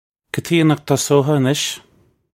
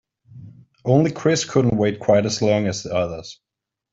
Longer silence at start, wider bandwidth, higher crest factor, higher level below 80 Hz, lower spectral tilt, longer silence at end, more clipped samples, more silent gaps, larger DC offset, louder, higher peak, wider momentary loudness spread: about the same, 0.35 s vs 0.3 s; first, 16.5 kHz vs 7.8 kHz; about the same, 18 dB vs 18 dB; second, -58 dBFS vs -52 dBFS; about the same, -5 dB/octave vs -5.5 dB/octave; about the same, 0.6 s vs 0.6 s; neither; neither; neither; first, -17 LUFS vs -20 LUFS; about the same, -2 dBFS vs -4 dBFS; about the same, 12 LU vs 11 LU